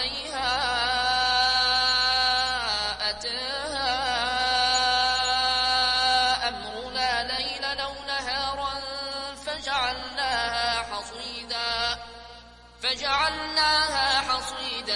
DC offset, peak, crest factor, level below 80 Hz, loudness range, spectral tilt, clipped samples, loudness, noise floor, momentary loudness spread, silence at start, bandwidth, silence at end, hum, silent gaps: under 0.1%; -10 dBFS; 16 dB; -48 dBFS; 6 LU; -1 dB/octave; under 0.1%; -24 LUFS; -48 dBFS; 11 LU; 0 s; 11.5 kHz; 0 s; 60 Hz at -50 dBFS; none